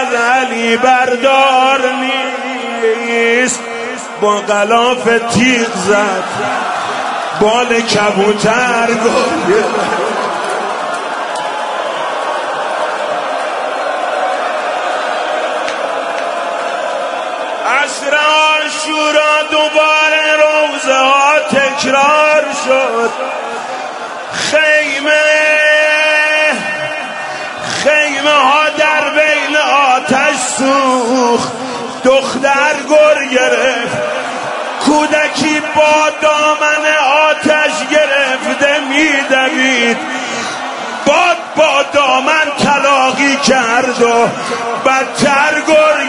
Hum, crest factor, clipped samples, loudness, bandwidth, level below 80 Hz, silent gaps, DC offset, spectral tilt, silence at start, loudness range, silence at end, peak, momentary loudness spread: none; 12 dB; under 0.1%; -11 LUFS; 11 kHz; -56 dBFS; none; under 0.1%; -2.5 dB/octave; 0 s; 6 LU; 0 s; 0 dBFS; 9 LU